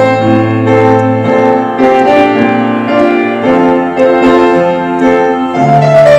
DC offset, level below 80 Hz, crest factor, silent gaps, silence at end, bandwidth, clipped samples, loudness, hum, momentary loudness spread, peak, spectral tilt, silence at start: under 0.1%; -44 dBFS; 8 dB; none; 0 s; 9.4 kHz; 4%; -8 LUFS; none; 4 LU; 0 dBFS; -7.5 dB/octave; 0 s